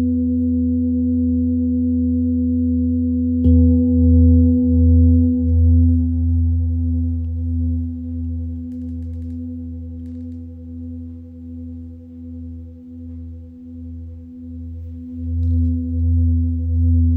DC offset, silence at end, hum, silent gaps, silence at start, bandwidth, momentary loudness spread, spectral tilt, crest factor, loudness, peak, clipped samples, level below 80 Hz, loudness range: under 0.1%; 0 s; none; none; 0 s; 0.9 kHz; 21 LU; -14.5 dB/octave; 12 dB; -18 LUFS; -6 dBFS; under 0.1%; -24 dBFS; 19 LU